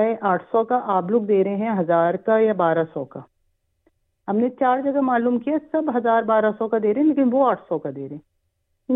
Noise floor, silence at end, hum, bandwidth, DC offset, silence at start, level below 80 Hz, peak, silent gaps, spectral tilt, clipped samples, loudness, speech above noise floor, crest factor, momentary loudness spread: -71 dBFS; 0 s; none; 4 kHz; under 0.1%; 0 s; -70 dBFS; -6 dBFS; none; -11 dB/octave; under 0.1%; -20 LUFS; 51 dB; 14 dB; 12 LU